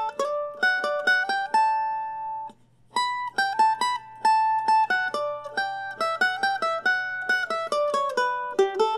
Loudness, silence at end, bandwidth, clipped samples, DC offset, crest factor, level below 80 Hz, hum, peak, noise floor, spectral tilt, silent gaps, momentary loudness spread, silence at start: -24 LUFS; 0 s; 12.5 kHz; under 0.1%; under 0.1%; 16 dB; -72 dBFS; none; -10 dBFS; -48 dBFS; -1.5 dB/octave; none; 8 LU; 0 s